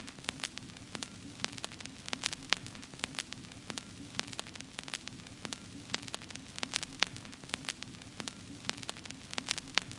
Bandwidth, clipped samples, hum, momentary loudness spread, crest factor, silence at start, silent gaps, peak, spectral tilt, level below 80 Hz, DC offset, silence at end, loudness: 11.5 kHz; under 0.1%; none; 11 LU; 38 dB; 0 s; none; -2 dBFS; -1.5 dB/octave; -66 dBFS; under 0.1%; 0 s; -39 LUFS